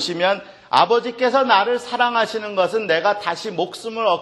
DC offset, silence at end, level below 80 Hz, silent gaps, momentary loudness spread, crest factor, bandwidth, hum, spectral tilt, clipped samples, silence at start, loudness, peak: under 0.1%; 0 s; -68 dBFS; none; 9 LU; 18 dB; 12.5 kHz; none; -3.5 dB/octave; under 0.1%; 0 s; -19 LUFS; 0 dBFS